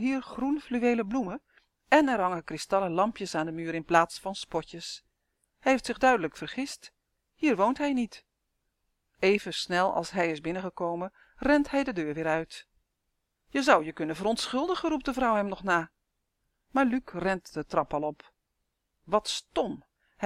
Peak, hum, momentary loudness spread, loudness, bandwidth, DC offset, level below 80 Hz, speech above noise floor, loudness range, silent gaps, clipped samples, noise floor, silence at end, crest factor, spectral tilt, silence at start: -6 dBFS; none; 12 LU; -29 LUFS; 14 kHz; under 0.1%; -58 dBFS; 52 dB; 3 LU; none; under 0.1%; -81 dBFS; 0 s; 24 dB; -4.5 dB/octave; 0 s